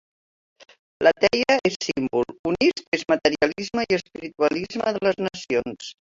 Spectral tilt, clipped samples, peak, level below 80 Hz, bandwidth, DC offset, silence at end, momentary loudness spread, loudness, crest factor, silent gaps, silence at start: -4 dB/octave; under 0.1%; -2 dBFS; -56 dBFS; 7.8 kHz; under 0.1%; 0.2 s; 8 LU; -23 LUFS; 20 dB; 1.76-1.80 s, 2.39-2.44 s, 2.88-2.92 s; 1 s